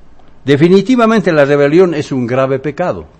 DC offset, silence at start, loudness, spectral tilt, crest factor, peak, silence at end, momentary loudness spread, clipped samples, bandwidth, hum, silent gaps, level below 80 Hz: under 0.1%; 0.45 s; -11 LUFS; -7 dB/octave; 12 dB; 0 dBFS; 0.15 s; 8 LU; 0.9%; 9 kHz; none; none; -44 dBFS